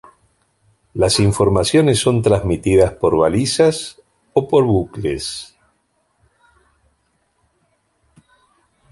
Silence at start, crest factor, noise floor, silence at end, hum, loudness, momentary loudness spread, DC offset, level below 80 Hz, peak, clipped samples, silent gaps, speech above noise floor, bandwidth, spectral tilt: 0.95 s; 18 dB; -65 dBFS; 3.45 s; none; -16 LUFS; 11 LU; under 0.1%; -38 dBFS; -2 dBFS; under 0.1%; none; 50 dB; 12 kHz; -5.5 dB/octave